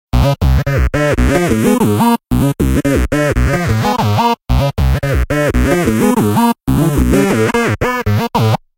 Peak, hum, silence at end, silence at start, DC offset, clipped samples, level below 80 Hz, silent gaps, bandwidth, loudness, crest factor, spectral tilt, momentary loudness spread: 0 dBFS; none; 0.2 s; 0.15 s; under 0.1%; under 0.1%; -20 dBFS; none; 17 kHz; -13 LUFS; 12 dB; -6.5 dB/octave; 3 LU